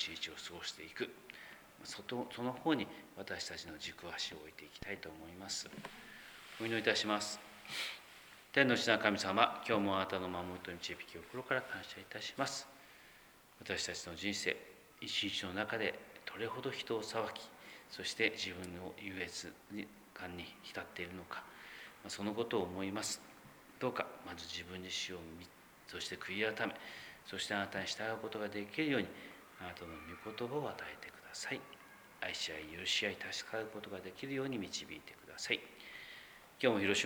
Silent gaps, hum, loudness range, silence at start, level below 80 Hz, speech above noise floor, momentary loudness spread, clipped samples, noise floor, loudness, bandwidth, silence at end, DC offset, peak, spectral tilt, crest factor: none; none; 9 LU; 0 s; -72 dBFS; 22 dB; 17 LU; under 0.1%; -62 dBFS; -40 LUFS; over 20 kHz; 0 s; under 0.1%; -12 dBFS; -3 dB/octave; 30 dB